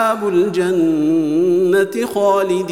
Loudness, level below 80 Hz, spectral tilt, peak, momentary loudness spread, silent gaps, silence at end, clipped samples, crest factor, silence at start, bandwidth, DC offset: -16 LUFS; -64 dBFS; -6 dB/octave; -4 dBFS; 2 LU; none; 0 s; under 0.1%; 10 dB; 0 s; 16 kHz; 0.3%